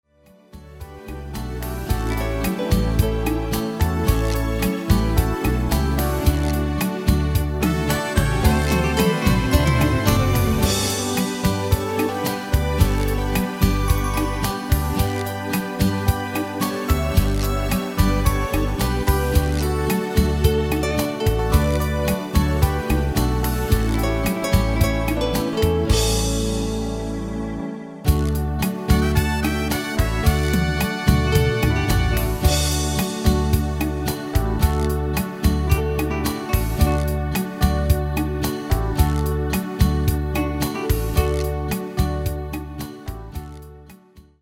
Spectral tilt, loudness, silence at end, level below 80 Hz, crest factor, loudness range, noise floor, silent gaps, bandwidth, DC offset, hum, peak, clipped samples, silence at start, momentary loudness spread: -5.5 dB/octave; -21 LUFS; 0.2 s; -24 dBFS; 20 dB; 3 LU; -52 dBFS; none; 17 kHz; under 0.1%; none; 0 dBFS; under 0.1%; 0.55 s; 6 LU